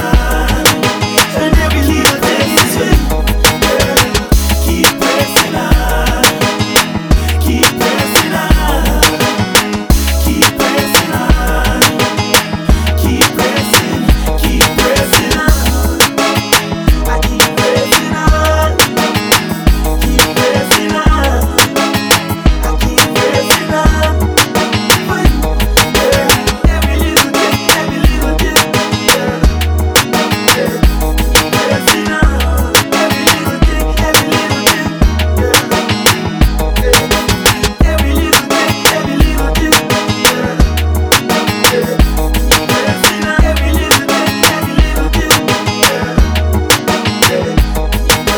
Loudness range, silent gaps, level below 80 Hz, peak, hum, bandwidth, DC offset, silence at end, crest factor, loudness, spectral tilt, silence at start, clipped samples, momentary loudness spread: 1 LU; none; -16 dBFS; 0 dBFS; none; over 20 kHz; under 0.1%; 0 s; 10 dB; -11 LUFS; -3.5 dB/octave; 0 s; 0.4%; 4 LU